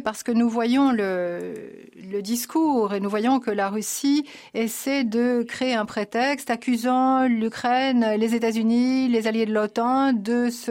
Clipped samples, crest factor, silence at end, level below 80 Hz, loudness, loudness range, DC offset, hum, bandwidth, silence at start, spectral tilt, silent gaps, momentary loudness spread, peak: under 0.1%; 10 dB; 0 s; -66 dBFS; -23 LUFS; 3 LU; under 0.1%; none; 16.5 kHz; 0 s; -4.5 dB/octave; none; 7 LU; -12 dBFS